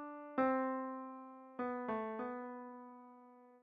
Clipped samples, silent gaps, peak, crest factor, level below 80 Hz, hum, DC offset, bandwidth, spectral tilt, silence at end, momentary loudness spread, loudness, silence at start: under 0.1%; none; -22 dBFS; 20 dB; -82 dBFS; none; under 0.1%; 4.9 kHz; -5 dB/octave; 0.05 s; 22 LU; -41 LUFS; 0 s